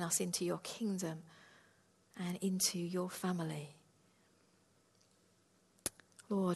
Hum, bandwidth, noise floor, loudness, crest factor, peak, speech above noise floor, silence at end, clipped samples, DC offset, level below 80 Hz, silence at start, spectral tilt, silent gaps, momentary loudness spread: none; 12.5 kHz; -72 dBFS; -39 LUFS; 24 dB; -18 dBFS; 33 dB; 0 s; under 0.1%; under 0.1%; -80 dBFS; 0 s; -4 dB/octave; none; 14 LU